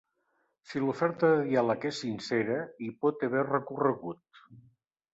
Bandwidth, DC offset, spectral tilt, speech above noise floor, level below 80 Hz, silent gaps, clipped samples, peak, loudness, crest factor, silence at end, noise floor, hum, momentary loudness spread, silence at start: 8 kHz; under 0.1%; -6.5 dB/octave; 46 dB; -74 dBFS; none; under 0.1%; -12 dBFS; -30 LUFS; 18 dB; 0.55 s; -76 dBFS; none; 12 LU; 0.7 s